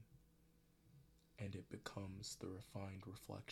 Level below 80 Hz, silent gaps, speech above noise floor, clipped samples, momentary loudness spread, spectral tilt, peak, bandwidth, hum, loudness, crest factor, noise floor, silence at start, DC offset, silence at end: -74 dBFS; none; 22 dB; under 0.1%; 4 LU; -5 dB/octave; -30 dBFS; 17.5 kHz; none; -52 LUFS; 24 dB; -74 dBFS; 0 s; under 0.1%; 0 s